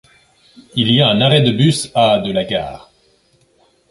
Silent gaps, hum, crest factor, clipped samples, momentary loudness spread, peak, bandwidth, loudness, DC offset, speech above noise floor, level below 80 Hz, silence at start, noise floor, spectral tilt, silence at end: none; none; 16 dB; under 0.1%; 10 LU; 0 dBFS; 11.5 kHz; -14 LUFS; under 0.1%; 42 dB; -48 dBFS; 0.75 s; -56 dBFS; -5.5 dB/octave; 1.15 s